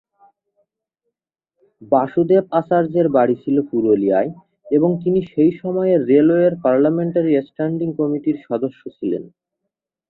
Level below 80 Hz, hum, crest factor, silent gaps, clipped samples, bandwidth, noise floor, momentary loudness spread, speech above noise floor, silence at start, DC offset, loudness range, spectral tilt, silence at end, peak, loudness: -62 dBFS; none; 16 dB; none; under 0.1%; 4.2 kHz; -81 dBFS; 9 LU; 64 dB; 1.8 s; under 0.1%; 4 LU; -11.5 dB/octave; 0.8 s; -2 dBFS; -18 LUFS